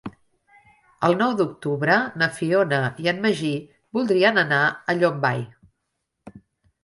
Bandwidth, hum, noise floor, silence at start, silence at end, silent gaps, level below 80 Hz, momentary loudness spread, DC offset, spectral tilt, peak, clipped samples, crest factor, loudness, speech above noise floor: 11.5 kHz; none; -78 dBFS; 0.05 s; 0.45 s; none; -64 dBFS; 10 LU; under 0.1%; -6 dB/octave; -2 dBFS; under 0.1%; 20 dB; -21 LUFS; 57 dB